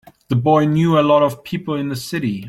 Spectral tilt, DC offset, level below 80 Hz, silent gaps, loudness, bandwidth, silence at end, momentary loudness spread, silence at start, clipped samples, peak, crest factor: -7 dB/octave; under 0.1%; -54 dBFS; none; -17 LUFS; 16 kHz; 0 s; 10 LU; 0.3 s; under 0.1%; -2 dBFS; 14 dB